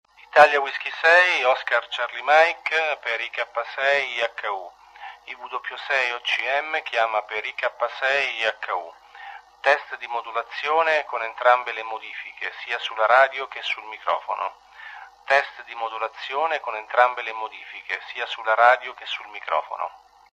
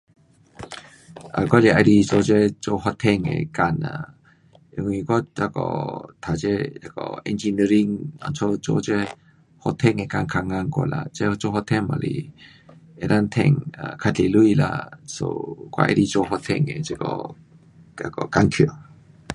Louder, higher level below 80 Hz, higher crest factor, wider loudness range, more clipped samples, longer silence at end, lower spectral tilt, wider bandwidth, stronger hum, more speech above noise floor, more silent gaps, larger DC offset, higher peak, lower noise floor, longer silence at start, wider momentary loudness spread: about the same, -22 LUFS vs -22 LUFS; second, -70 dBFS vs -48 dBFS; about the same, 22 dB vs 22 dB; about the same, 5 LU vs 6 LU; neither; first, 0.4 s vs 0 s; second, -0.5 dB/octave vs -6.5 dB/octave; about the same, 10.5 kHz vs 11.5 kHz; neither; second, 19 dB vs 33 dB; neither; neither; about the same, -2 dBFS vs 0 dBFS; second, -43 dBFS vs -54 dBFS; second, 0.35 s vs 0.6 s; about the same, 16 LU vs 15 LU